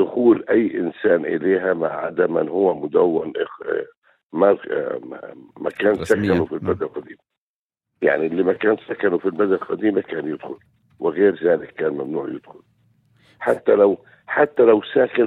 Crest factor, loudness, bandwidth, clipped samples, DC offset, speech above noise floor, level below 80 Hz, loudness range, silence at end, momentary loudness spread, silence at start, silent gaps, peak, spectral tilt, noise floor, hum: 20 dB; -20 LUFS; 11 kHz; under 0.1%; under 0.1%; over 71 dB; -60 dBFS; 4 LU; 0 s; 13 LU; 0 s; 3.97-4.02 s, 4.23-4.29 s, 7.38-7.69 s; -2 dBFS; -7.5 dB/octave; under -90 dBFS; none